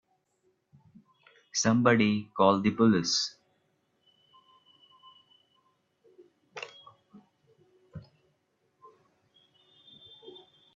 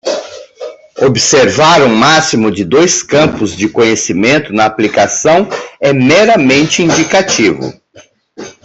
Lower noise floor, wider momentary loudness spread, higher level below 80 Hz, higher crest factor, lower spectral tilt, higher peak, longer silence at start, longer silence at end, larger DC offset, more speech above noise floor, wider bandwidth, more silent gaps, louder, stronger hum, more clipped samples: first, -74 dBFS vs -42 dBFS; first, 26 LU vs 14 LU; second, -70 dBFS vs -46 dBFS; first, 26 dB vs 10 dB; about the same, -4.5 dB/octave vs -3.5 dB/octave; second, -8 dBFS vs 0 dBFS; first, 1.55 s vs 0.05 s; first, 0.45 s vs 0.15 s; neither; first, 50 dB vs 33 dB; about the same, 7.8 kHz vs 8.4 kHz; neither; second, -26 LUFS vs -9 LUFS; neither; neither